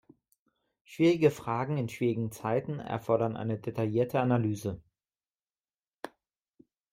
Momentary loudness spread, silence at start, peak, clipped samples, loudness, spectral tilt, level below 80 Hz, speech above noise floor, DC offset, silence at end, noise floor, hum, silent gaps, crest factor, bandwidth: 20 LU; 0.9 s; -12 dBFS; under 0.1%; -30 LUFS; -7.5 dB/octave; -66 dBFS; over 61 dB; under 0.1%; 0.85 s; under -90 dBFS; none; 5.59-5.63 s, 5.87-5.91 s; 20 dB; 16 kHz